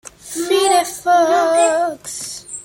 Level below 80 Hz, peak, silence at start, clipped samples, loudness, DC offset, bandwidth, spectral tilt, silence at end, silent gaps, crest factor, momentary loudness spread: -58 dBFS; -2 dBFS; 0.05 s; under 0.1%; -16 LUFS; under 0.1%; 17 kHz; -1.5 dB/octave; 0 s; none; 14 dB; 13 LU